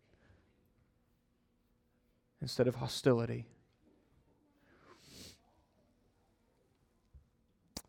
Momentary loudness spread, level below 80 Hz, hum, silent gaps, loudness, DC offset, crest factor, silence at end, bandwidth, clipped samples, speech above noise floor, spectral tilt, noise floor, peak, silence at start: 24 LU; -70 dBFS; none; none; -35 LUFS; under 0.1%; 26 dB; 0.05 s; 17.5 kHz; under 0.1%; 42 dB; -6 dB/octave; -76 dBFS; -16 dBFS; 2.4 s